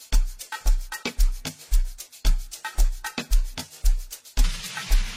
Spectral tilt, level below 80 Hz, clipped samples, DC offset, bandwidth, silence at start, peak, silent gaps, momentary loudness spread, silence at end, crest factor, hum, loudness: -3 dB/octave; -22 dBFS; under 0.1%; under 0.1%; 16 kHz; 0 s; -8 dBFS; none; 6 LU; 0 s; 14 dB; none; -29 LUFS